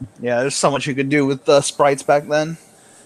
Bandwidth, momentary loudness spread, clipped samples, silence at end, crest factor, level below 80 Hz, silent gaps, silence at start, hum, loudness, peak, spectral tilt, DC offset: 13.5 kHz; 6 LU; under 0.1%; 0.5 s; 16 dB; -58 dBFS; none; 0 s; none; -18 LUFS; -2 dBFS; -4.5 dB/octave; under 0.1%